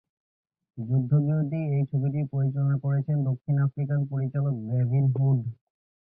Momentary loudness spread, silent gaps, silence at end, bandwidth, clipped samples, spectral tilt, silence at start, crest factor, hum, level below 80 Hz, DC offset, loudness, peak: 5 LU; none; 0.6 s; 2.7 kHz; under 0.1%; -14.5 dB/octave; 0.75 s; 14 dB; none; -62 dBFS; under 0.1%; -26 LUFS; -12 dBFS